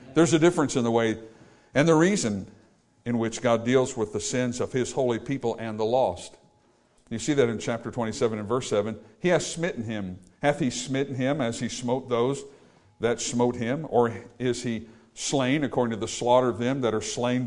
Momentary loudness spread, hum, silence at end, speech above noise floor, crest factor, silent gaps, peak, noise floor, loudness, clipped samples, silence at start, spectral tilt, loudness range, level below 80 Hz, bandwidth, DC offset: 10 LU; none; 0 s; 37 dB; 18 dB; none; -8 dBFS; -63 dBFS; -26 LUFS; under 0.1%; 0 s; -5 dB/octave; 3 LU; -58 dBFS; 11 kHz; under 0.1%